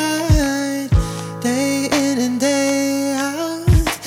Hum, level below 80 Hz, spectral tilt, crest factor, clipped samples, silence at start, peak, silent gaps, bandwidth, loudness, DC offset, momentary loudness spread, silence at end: none; -26 dBFS; -5 dB/octave; 16 dB; under 0.1%; 0 s; -2 dBFS; none; over 20 kHz; -18 LUFS; under 0.1%; 5 LU; 0 s